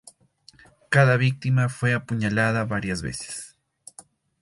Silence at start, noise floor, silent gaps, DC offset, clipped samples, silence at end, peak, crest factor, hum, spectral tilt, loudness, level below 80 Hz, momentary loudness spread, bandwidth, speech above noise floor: 0.9 s; -56 dBFS; none; under 0.1%; under 0.1%; 0.95 s; -4 dBFS; 20 dB; none; -6 dB/octave; -23 LUFS; -52 dBFS; 14 LU; 11.5 kHz; 33 dB